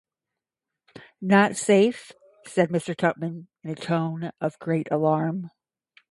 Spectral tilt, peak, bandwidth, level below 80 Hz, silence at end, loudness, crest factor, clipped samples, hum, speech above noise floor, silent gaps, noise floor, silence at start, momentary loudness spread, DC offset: -6 dB/octave; -6 dBFS; 11.5 kHz; -70 dBFS; 0.65 s; -24 LUFS; 20 dB; under 0.1%; none; 64 dB; none; -88 dBFS; 0.95 s; 15 LU; under 0.1%